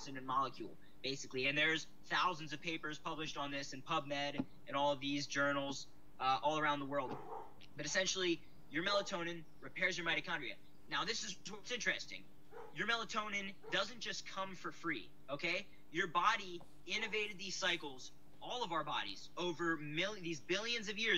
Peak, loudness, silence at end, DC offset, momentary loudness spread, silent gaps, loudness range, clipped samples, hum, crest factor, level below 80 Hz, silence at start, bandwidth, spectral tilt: -20 dBFS; -39 LUFS; 0 s; 0.3%; 13 LU; none; 3 LU; under 0.1%; none; 22 dB; -72 dBFS; 0 s; 16 kHz; -3 dB/octave